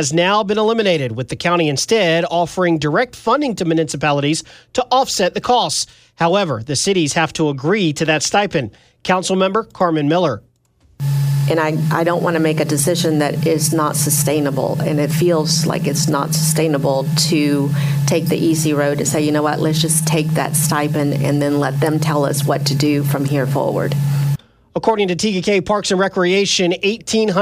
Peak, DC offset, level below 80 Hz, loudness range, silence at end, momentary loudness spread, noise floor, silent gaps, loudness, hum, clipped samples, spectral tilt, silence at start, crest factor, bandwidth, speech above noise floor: -2 dBFS; under 0.1%; -52 dBFS; 2 LU; 0 s; 4 LU; -55 dBFS; none; -16 LUFS; none; under 0.1%; -4.5 dB/octave; 0 s; 14 dB; 16 kHz; 39 dB